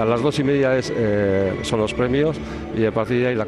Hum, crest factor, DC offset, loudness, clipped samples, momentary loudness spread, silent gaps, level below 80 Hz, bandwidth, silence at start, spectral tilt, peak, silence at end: none; 12 dB; under 0.1%; -20 LUFS; under 0.1%; 4 LU; none; -42 dBFS; 12 kHz; 0 s; -6.5 dB/octave; -8 dBFS; 0 s